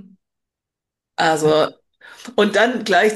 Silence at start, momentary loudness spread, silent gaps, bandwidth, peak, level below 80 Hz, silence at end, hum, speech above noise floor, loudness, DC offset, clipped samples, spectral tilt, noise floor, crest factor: 1.2 s; 12 LU; none; 12.5 kHz; -4 dBFS; -64 dBFS; 0 s; none; 68 dB; -17 LUFS; under 0.1%; under 0.1%; -4 dB/octave; -85 dBFS; 16 dB